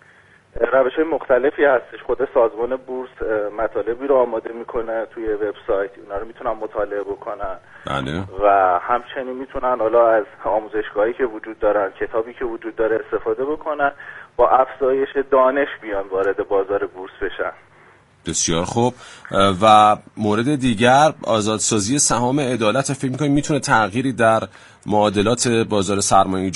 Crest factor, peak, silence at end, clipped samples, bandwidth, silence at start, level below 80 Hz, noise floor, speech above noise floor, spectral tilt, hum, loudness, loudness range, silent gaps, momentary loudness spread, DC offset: 20 dB; 0 dBFS; 0 s; under 0.1%; 11.5 kHz; 0.55 s; -44 dBFS; -51 dBFS; 32 dB; -4 dB/octave; none; -19 LUFS; 7 LU; none; 12 LU; under 0.1%